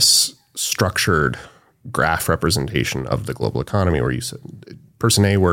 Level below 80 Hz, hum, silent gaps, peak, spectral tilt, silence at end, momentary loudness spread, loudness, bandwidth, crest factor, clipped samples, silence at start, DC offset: -38 dBFS; none; none; -2 dBFS; -3.5 dB/octave; 0 s; 12 LU; -19 LUFS; 17 kHz; 18 dB; under 0.1%; 0 s; under 0.1%